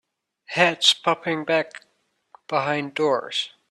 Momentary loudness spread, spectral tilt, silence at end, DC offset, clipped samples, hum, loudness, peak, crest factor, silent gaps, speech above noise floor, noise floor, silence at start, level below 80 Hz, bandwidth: 11 LU; -3 dB/octave; 0.25 s; under 0.1%; under 0.1%; none; -22 LUFS; -2 dBFS; 22 dB; none; 33 dB; -56 dBFS; 0.5 s; -72 dBFS; 13.5 kHz